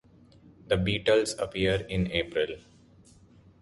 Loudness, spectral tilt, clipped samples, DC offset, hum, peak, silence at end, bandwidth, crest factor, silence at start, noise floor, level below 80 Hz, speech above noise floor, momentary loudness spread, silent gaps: -28 LUFS; -5 dB/octave; under 0.1%; under 0.1%; none; -10 dBFS; 1 s; 11.5 kHz; 20 dB; 0.7 s; -57 dBFS; -48 dBFS; 29 dB; 7 LU; none